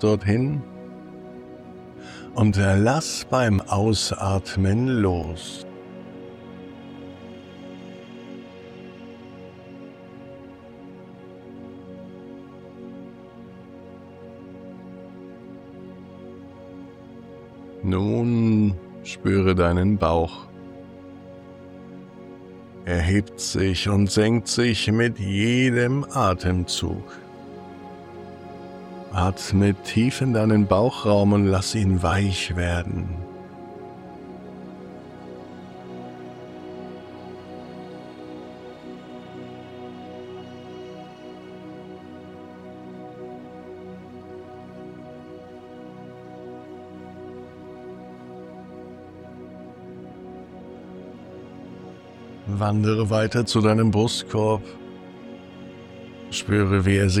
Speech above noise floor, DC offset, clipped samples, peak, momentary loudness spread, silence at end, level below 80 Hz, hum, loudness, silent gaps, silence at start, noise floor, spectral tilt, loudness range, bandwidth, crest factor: 22 dB; under 0.1%; under 0.1%; -4 dBFS; 22 LU; 0 s; -50 dBFS; none; -22 LUFS; none; 0 s; -43 dBFS; -6 dB/octave; 20 LU; 13.5 kHz; 20 dB